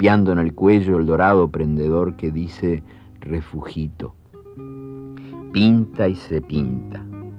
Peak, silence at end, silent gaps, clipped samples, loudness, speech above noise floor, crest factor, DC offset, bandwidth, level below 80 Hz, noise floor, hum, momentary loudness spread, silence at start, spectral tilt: -4 dBFS; 0 s; none; under 0.1%; -19 LUFS; 20 dB; 16 dB; under 0.1%; 6 kHz; -40 dBFS; -38 dBFS; none; 20 LU; 0 s; -9 dB/octave